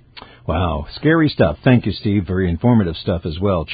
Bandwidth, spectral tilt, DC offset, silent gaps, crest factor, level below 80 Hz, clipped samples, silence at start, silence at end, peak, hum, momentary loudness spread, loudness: 5 kHz; -12.5 dB/octave; under 0.1%; none; 18 dB; -32 dBFS; under 0.1%; 0.15 s; 0 s; 0 dBFS; none; 7 LU; -18 LUFS